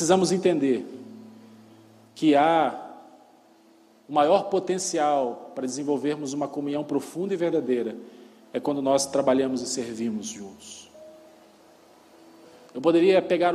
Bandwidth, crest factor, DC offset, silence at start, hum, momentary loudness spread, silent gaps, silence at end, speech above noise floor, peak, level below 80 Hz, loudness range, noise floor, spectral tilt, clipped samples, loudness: 13.5 kHz; 18 dB; under 0.1%; 0 s; none; 20 LU; none; 0 s; 33 dB; -6 dBFS; -72 dBFS; 4 LU; -56 dBFS; -4.5 dB/octave; under 0.1%; -24 LUFS